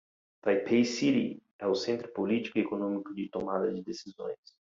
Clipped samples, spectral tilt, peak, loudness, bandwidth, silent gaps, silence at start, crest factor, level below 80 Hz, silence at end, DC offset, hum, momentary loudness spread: under 0.1%; -5.5 dB/octave; -14 dBFS; -31 LUFS; 7.6 kHz; 1.51-1.59 s; 0.45 s; 18 dB; -72 dBFS; 0.4 s; under 0.1%; none; 13 LU